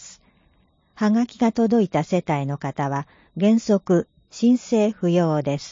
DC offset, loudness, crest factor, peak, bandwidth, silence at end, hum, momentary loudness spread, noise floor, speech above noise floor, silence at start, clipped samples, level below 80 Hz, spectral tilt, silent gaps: under 0.1%; -21 LUFS; 14 dB; -8 dBFS; 7.6 kHz; 0 s; none; 8 LU; -61 dBFS; 41 dB; 0 s; under 0.1%; -60 dBFS; -7 dB/octave; none